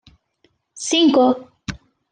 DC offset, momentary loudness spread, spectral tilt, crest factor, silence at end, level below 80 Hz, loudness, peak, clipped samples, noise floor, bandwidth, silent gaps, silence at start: under 0.1%; 19 LU; -3.5 dB/octave; 16 dB; 0.35 s; -52 dBFS; -17 LUFS; -4 dBFS; under 0.1%; -64 dBFS; 10 kHz; none; 0.75 s